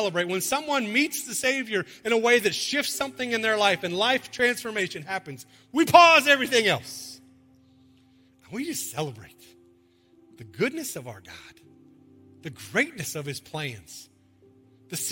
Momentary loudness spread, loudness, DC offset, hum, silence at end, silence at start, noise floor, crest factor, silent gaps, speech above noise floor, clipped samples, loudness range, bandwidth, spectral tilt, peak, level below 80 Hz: 22 LU; -24 LUFS; under 0.1%; none; 0 s; 0 s; -60 dBFS; 26 dB; none; 35 dB; under 0.1%; 15 LU; 17 kHz; -3 dB/octave; 0 dBFS; -68 dBFS